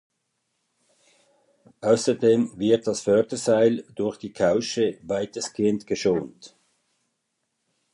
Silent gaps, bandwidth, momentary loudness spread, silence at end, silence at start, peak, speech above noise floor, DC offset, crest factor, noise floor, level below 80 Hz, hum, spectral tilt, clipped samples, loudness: none; 11 kHz; 9 LU; 1.45 s; 1.8 s; -8 dBFS; 54 dB; under 0.1%; 18 dB; -77 dBFS; -62 dBFS; none; -5 dB/octave; under 0.1%; -23 LUFS